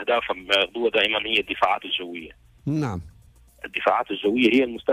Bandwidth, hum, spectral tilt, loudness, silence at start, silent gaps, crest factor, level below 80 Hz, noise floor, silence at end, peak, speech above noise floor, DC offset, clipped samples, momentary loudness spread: 15 kHz; none; -5.5 dB/octave; -22 LUFS; 0 s; none; 16 dB; -54 dBFS; -53 dBFS; 0 s; -8 dBFS; 30 dB; under 0.1%; under 0.1%; 15 LU